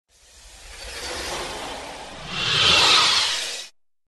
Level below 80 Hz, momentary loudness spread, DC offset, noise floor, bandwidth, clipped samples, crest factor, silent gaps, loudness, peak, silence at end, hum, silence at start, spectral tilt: -48 dBFS; 21 LU; under 0.1%; -49 dBFS; 12.5 kHz; under 0.1%; 18 dB; none; -18 LUFS; -4 dBFS; 0.4 s; none; 0.35 s; -0.5 dB/octave